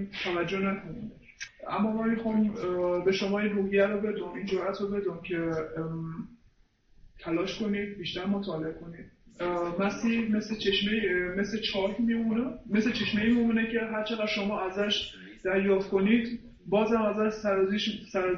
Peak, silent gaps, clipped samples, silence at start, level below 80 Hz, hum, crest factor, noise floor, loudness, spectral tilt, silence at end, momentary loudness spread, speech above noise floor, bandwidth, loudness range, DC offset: -12 dBFS; none; under 0.1%; 0 s; -56 dBFS; none; 16 dB; -63 dBFS; -29 LUFS; -6 dB/octave; 0 s; 11 LU; 34 dB; 6.8 kHz; 6 LU; under 0.1%